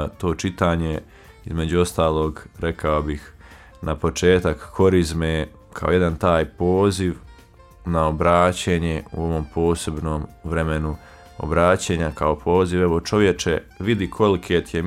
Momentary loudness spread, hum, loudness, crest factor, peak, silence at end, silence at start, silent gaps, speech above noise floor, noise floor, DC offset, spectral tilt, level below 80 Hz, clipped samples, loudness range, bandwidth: 11 LU; none; -21 LUFS; 18 dB; -2 dBFS; 0 s; 0 s; none; 27 dB; -47 dBFS; under 0.1%; -6 dB/octave; -36 dBFS; under 0.1%; 3 LU; 15 kHz